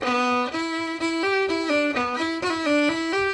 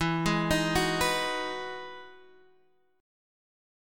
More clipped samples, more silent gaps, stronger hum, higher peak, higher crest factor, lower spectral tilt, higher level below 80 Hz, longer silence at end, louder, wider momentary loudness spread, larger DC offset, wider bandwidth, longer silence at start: neither; neither; neither; about the same, -10 dBFS vs -12 dBFS; second, 12 dB vs 18 dB; about the same, -3.5 dB/octave vs -4 dB/octave; second, -60 dBFS vs -48 dBFS; second, 0 s vs 1 s; first, -23 LUFS vs -28 LUFS; second, 5 LU vs 16 LU; neither; second, 11.5 kHz vs 17.5 kHz; about the same, 0 s vs 0 s